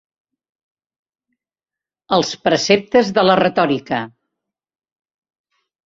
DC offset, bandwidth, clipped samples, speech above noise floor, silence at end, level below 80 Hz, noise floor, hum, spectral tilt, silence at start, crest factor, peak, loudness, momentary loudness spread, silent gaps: under 0.1%; 7.8 kHz; under 0.1%; 74 dB; 1.75 s; -58 dBFS; -90 dBFS; none; -4.5 dB/octave; 2.1 s; 18 dB; -2 dBFS; -16 LUFS; 10 LU; none